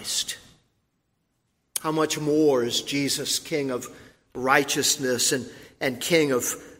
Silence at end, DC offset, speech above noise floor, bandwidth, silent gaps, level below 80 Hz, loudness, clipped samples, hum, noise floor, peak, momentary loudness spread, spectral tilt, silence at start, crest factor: 0.05 s; under 0.1%; 49 dB; 16 kHz; none; -64 dBFS; -24 LUFS; under 0.1%; none; -74 dBFS; -4 dBFS; 12 LU; -2.5 dB/octave; 0 s; 22 dB